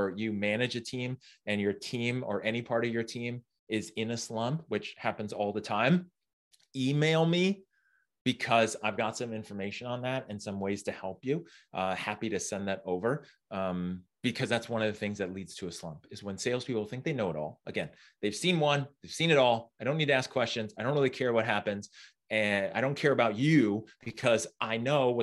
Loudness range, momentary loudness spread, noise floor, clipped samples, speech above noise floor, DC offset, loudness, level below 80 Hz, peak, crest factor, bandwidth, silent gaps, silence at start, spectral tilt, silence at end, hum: 6 LU; 12 LU; -73 dBFS; under 0.1%; 42 dB; under 0.1%; -31 LUFS; -72 dBFS; -10 dBFS; 22 dB; 12.5 kHz; 3.59-3.67 s, 6.33-6.51 s, 8.21-8.25 s; 0 s; -5 dB/octave; 0 s; none